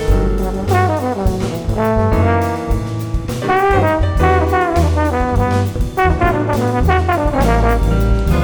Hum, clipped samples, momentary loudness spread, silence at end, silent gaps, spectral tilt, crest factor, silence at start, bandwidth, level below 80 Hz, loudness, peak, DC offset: none; under 0.1%; 6 LU; 0 s; none; -7 dB/octave; 10 dB; 0 s; over 20 kHz; -20 dBFS; -16 LUFS; -4 dBFS; under 0.1%